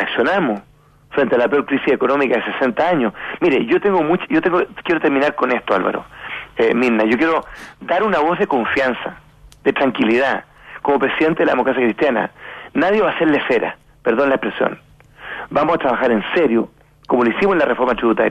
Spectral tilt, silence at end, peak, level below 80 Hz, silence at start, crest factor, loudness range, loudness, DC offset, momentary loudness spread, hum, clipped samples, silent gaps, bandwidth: -6.5 dB/octave; 0 s; -2 dBFS; -52 dBFS; 0 s; 14 dB; 2 LU; -17 LUFS; under 0.1%; 10 LU; none; under 0.1%; none; 9 kHz